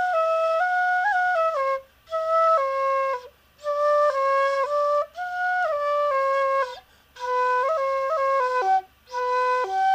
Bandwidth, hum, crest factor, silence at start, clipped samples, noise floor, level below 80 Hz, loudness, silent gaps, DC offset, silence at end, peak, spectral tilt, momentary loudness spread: 15.5 kHz; none; 12 dB; 0 s; under 0.1%; -44 dBFS; -64 dBFS; -23 LUFS; none; under 0.1%; 0 s; -12 dBFS; -2 dB/octave; 9 LU